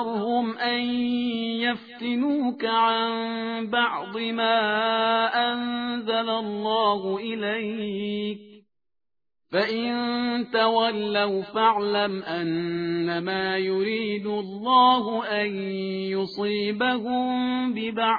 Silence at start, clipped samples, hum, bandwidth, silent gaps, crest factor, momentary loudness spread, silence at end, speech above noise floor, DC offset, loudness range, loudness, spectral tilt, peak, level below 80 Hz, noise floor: 0 s; under 0.1%; none; 5 kHz; none; 18 dB; 7 LU; 0 s; 53 dB; under 0.1%; 4 LU; -25 LUFS; -7.5 dB/octave; -6 dBFS; -68 dBFS; -78 dBFS